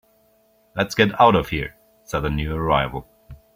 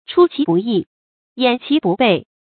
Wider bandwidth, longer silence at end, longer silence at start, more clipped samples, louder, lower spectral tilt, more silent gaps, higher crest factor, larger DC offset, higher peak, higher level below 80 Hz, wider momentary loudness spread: first, 16.5 kHz vs 4.6 kHz; about the same, 0.2 s vs 0.25 s; first, 0.75 s vs 0.1 s; neither; second, -20 LUFS vs -17 LUFS; second, -5.5 dB/octave vs -11 dB/octave; second, none vs 0.87-1.36 s; about the same, 20 dB vs 16 dB; neither; about the same, -2 dBFS vs 0 dBFS; first, -38 dBFS vs -62 dBFS; first, 16 LU vs 7 LU